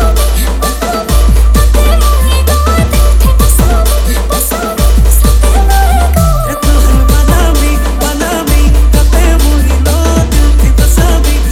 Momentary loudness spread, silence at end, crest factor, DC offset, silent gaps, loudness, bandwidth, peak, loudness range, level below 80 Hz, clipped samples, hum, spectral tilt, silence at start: 4 LU; 0 s; 6 dB; under 0.1%; none; -9 LUFS; 16.5 kHz; 0 dBFS; 1 LU; -8 dBFS; 0.6%; none; -5 dB/octave; 0 s